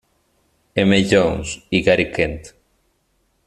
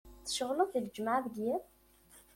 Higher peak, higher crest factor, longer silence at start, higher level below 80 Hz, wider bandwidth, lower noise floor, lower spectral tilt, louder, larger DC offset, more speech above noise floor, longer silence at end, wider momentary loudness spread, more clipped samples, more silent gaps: first, -2 dBFS vs -18 dBFS; about the same, 18 dB vs 20 dB; first, 0.75 s vs 0.05 s; first, -42 dBFS vs -66 dBFS; second, 12 kHz vs 16.5 kHz; about the same, -65 dBFS vs -62 dBFS; first, -5 dB/octave vs -3.5 dB/octave; first, -18 LUFS vs -35 LUFS; neither; first, 48 dB vs 28 dB; first, 1 s vs 0.15 s; first, 11 LU vs 5 LU; neither; neither